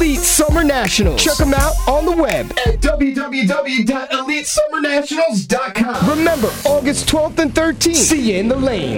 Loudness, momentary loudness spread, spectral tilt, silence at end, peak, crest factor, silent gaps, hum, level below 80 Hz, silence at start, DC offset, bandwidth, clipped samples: -15 LUFS; 5 LU; -3.5 dB/octave; 0 s; -4 dBFS; 12 dB; none; none; -24 dBFS; 0 s; under 0.1%; over 20 kHz; under 0.1%